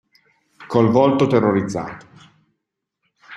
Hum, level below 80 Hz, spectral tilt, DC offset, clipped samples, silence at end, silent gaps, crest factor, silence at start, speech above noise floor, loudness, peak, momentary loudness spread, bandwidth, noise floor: none; -56 dBFS; -7.5 dB/octave; under 0.1%; under 0.1%; 0 s; none; 20 dB; 0.6 s; 62 dB; -17 LUFS; -2 dBFS; 16 LU; 11 kHz; -79 dBFS